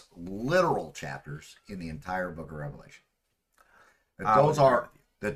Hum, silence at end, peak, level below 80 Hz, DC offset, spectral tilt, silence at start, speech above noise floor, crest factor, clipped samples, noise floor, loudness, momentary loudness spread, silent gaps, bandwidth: none; 0 s; -10 dBFS; -56 dBFS; under 0.1%; -6 dB/octave; 0.15 s; 49 dB; 20 dB; under 0.1%; -77 dBFS; -27 LUFS; 20 LU; none; 14.5 kHz